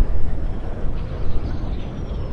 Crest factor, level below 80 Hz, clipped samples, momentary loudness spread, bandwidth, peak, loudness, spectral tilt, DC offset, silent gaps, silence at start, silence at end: 12 dB; -24 dBFS; under 0.1%; 2 LU; 4.7 kHz; -4 dBFS; -29 LUFS; -8.5 dB/octave; under 0.1%; none; 0 s; 0 s